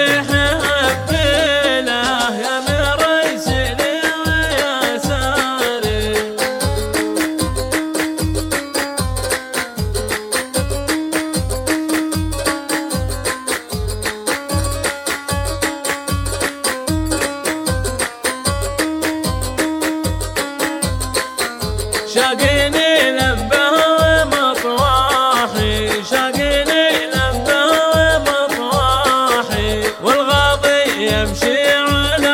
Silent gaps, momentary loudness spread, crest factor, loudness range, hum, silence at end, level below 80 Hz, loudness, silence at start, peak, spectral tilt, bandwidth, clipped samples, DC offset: none; 7 LU; 16 dB; 6 LU; none; 0 s; -30 dBFS; -16 LUFS; 0 s; -2 dBFS; -3.5 dB/octave; 17 kHz; under 0.1%; under 0.1%